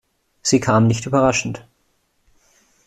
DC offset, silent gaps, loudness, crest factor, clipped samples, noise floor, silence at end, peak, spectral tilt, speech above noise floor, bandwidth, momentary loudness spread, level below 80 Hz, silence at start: under 0.1%; none; -18 LUFS; 18 dB; under 0.1%; -65 dBFS; 1.25 s; -2 dBFS; -5 dB/octave; 48 dB; 13 kHz; 12 LU; -50 dBFS; 0.45 s